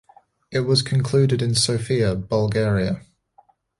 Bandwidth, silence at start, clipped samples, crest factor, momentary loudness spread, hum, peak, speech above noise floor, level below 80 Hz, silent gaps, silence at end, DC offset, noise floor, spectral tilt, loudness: 11.5 kHz; 0.5 s; under 0.1%; 16 dB; 7 LU; none; -6 dBFS; 38 dB; -46 dBFS; none; 0.8 s; under 0.1%; -58 dBFS; -5 dB/octave; -21 LUFS